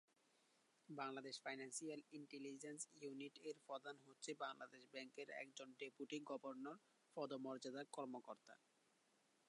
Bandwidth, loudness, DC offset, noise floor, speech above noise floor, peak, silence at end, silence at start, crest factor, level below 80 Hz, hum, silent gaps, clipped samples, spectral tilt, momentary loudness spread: 11 kHz; -54 LUFS; under 0.1%; -81 dBFS; 27 dB; -36 dBFS; 0.9 s; 0.9 s; 20 dB; under -90 dBFS; none; none; under 0.1%; -3 dB/octave; 8 LU